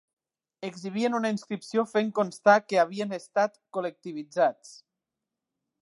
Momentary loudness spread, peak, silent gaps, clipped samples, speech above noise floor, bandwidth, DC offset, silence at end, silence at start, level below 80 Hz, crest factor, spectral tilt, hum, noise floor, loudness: 15 LU; -6 dBFS; none; under 0.1%; 60 dB; 11.5 kHz; under 0.1%; 1.1 s; 0.6 s; -82 dBFS; 22 dB; -5 dB/octave; none; -87 dBFS; -27 LUFS